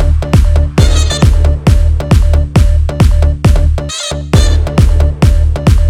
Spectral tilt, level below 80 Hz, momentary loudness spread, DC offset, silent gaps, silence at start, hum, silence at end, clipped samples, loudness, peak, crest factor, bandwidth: -6 dB/octave; -10 dBFS; 2 LU; 0.6%; none; 0 s; none; 0 s; under 0.1%; -11 LUFS; 0 dBFS; 8 dB; 12.5 kHz